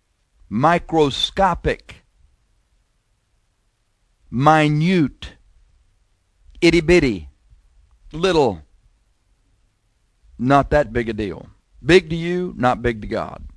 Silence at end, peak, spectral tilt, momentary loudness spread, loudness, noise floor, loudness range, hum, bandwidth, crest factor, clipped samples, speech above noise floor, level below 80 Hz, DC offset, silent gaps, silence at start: 0.05 s; 0 dBFS; -6 dB/octave; 14 LU; -18 LUFS; -66 dBFS; 5 LU; none; 11 kHz; 20 dB; under 0.1%; 48 dB; -38 dBFS; under 0.1%; none; 0.5 s